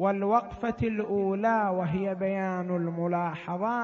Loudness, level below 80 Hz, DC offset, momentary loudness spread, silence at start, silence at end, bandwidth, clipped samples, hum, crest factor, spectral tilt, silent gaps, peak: -29 LUFS; -56 dBFS; under 0.1%; 5 LU; 0 s; 0 s; 6.8 kHz; under 0.1%; none; 16 dB; -9 dB/octave; none; -12 dBFS